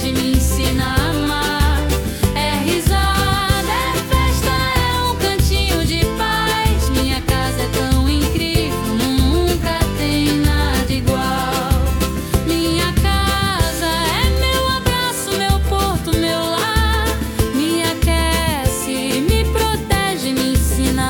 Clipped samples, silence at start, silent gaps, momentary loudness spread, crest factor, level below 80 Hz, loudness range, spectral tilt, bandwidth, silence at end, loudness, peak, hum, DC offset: under 0.1%; 0 s; none; 3 LU; 14 dB; -22 dBFS; 1 LU; -4.5 dB/octave; 18 kHz; 0 s; -17 LUFS; -4 dBFS; none; under 0.1%